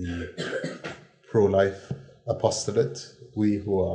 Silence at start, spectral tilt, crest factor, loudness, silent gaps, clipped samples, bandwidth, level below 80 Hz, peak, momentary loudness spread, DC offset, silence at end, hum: 0 s; -5.5 dB/octave; 20 dB; -26 LUFS; none; under 0.1%; 10 kHz; -60 dBFS; -6 dBFS; 17 LU; under 0.1%; 0 s; none